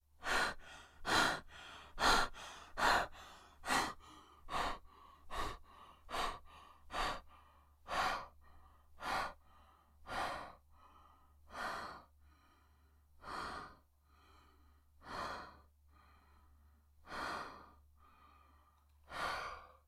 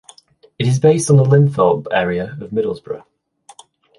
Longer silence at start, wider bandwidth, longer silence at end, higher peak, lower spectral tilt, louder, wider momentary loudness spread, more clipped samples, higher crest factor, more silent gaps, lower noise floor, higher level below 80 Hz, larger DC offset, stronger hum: second, 0.2 s vs 0.6 s; first, 16.5 kHz vs 11.5 kHz; second, 0.2 s vs 1 s; second, -18 dBFS vs -2 dBFS; second, -2 dB/octave vs -6.5 dB/octave; second, -40 LUFS vs -15 LUFS; first, 24 LU vs 14 LU; neither; first, 24 dB vs 14 dB; neither; first, -69 dBFS vs -49 dBFS; about the same, -56 dBFS vs -52 dBFS; neither; neither